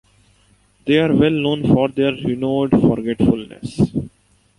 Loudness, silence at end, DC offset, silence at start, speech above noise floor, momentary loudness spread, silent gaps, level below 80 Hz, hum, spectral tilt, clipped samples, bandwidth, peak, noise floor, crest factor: -17 LUFS; 0.5 s; under 0.1%; 0.85 s; 39 dB; 10 LU; none; -42 dBFS; none; -8 dB/octave; under 0.1%; 11.5 kHz; -2 dBFS; -56 dBFS; 16 dB